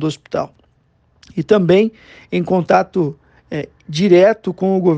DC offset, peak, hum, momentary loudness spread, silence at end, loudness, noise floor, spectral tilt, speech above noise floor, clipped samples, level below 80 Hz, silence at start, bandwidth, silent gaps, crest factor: under 0.1%; 0 dBFS; none; 15 LU; 0 s; -16 LUFS; -58 dBFS; -7 dB/octave; 42 dB; under 0.1%; -54 dBFS; 0 s; 8.4 kHz; none; 16 dB